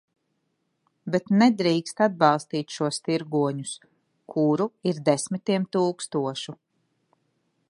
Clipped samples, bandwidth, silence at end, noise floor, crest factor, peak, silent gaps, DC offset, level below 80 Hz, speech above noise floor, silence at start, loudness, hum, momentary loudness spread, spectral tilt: under 0.1%; 11.5 kHz; 1.15 s; -75 dBFS; 22 dB; -4 dBFS; none; under 0.1%; -74 dBFS; 51 dB; 1.05 s; -25 LUFS; none; 13 LU; -5.5 dB/octave